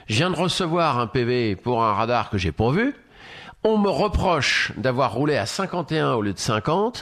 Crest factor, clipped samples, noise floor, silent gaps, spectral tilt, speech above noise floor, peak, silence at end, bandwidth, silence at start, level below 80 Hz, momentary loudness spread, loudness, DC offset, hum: 16 dB; under 0.1%; -43 dBFS; none; -5 dB/octave; 21 dB; -6 dBFS; 0 s; 14 kHz; 0.1 s; -40 dBFS; 5 LU; -22 LUFS; under 0.1%; none